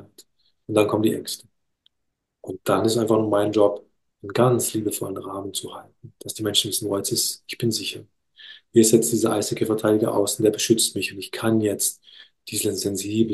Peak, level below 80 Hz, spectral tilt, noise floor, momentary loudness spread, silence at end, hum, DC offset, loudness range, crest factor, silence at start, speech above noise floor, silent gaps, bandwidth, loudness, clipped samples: -2 dBFS; -66 dBFS; -4 dB/octave; -78 dBFS; 15 LU; 0 s; none; under 0.1%; 5 LU; 20 dB; 0 s; 56 dB; none; 13 kHz; -22 LUFS; under 0.1%